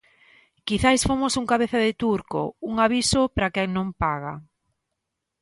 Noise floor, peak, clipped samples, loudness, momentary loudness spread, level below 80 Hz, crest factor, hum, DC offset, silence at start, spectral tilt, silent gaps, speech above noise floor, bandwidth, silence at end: -81 dBFS; -4 dBFS; under 0.1%; -23 LUFS; 10 LU; -42 dBFS; 20 dB; none; under 0.1%; 0.65 s; -4 dB/octave; none; 58 dB; 11.5 kHz; 1 s